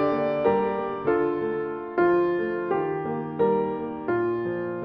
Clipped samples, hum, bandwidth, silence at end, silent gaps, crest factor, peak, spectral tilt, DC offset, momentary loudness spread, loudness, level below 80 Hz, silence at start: under 0.1%; none; 5.2 kHz; 0 s; none; 16 dB; -10 dBFS; -10 dB/octave; under 0.1%; 7 LU; -25 LUFS; -58 dBFS; 0 s